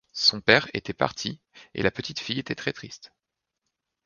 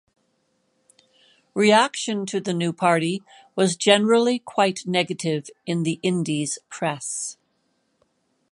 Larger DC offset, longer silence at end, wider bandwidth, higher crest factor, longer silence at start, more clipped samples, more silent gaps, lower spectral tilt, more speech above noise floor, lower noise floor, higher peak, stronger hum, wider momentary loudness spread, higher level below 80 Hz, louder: neither; second, 1 s vs 1.2 s; second, 10 kHz vs 11.5 kHz; first, 28 dB vs 22 dB; second, 0.15 s vs 1.55 s; neither; neither; about the same, -3.5 dB/octave vs -4 dB/octave; first, 56 dB vs 48 dB; first, -83 dBFS vs -70 dBFS; about the same, 0 dBFS vs -2 dBFS; neither; first, 19 LU vs 12 LU; first, -58 dBFS vs -72 dBFS; second, -25 LUFS vs -22 LUFS